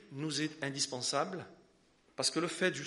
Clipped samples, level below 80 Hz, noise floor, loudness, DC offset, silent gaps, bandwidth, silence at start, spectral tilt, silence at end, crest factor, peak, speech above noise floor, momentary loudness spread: under 0.1%; -78 dBFS; -68 dBFS; -35 LUFS; under 0.1%; none; 11.5 kHz; 0 s; -3 dB/octave; 0 s; 20 dB; -16 dBFS; 33 dB; 13 LU